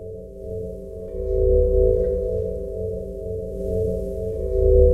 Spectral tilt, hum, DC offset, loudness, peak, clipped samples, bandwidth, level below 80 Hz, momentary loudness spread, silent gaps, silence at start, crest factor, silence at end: -11.5 dB/octave; none; under 0.1%; -23 LUFS; -2 dBFS; under 0.1%; 1.9 kHz; -26 dBFS; 15 LU; none; 0 s; 18 dB; 0 s